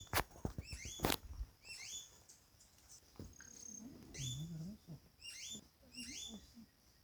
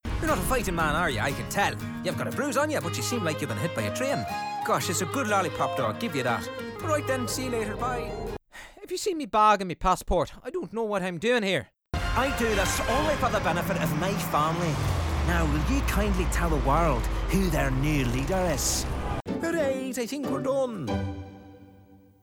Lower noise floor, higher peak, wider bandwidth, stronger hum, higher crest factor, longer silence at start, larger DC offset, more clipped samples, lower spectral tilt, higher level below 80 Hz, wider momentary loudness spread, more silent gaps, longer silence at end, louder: first, -67 dBFS vs -54 dBFS; second, -14 dBFS vs -10 dBFS; about the same, over 20 kHz vs over 20 kHz; neither; first, 34 dB vs 18 dB; about the same, 0 s vs 0.05 s; neither; neither; second, -3 dB/octave vs -4.5 dB/octave; second, -58 dBFS vs -36 dBFS; first, 22 LU vs 7 LU; neither; second, 0 s vs 0.25 s; second, -47 LUFS vs -27 LUFS